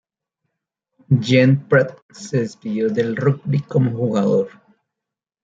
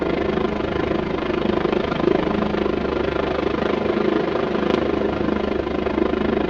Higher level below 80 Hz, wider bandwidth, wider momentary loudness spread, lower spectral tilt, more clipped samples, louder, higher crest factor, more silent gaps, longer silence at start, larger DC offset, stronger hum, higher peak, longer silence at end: second, -60 dBFS vs -38 dBFS; about the same, 7.8 kHz vs 7.2 kHz; first, 10 LU vs 2 LU; about the same, -7.5 dB/octave vs -7.5 dB/octave; neither; about the same, -19 LUFS vs -21 LUFS; about the same, 18 dB vs 18 dB; first, 2.02-2.09 s vs none; first, 1.1 s vs 0 s; neither; neither; about the same, -2 dBFS vs -2 dBFS; first, 0.95 s vs 0 s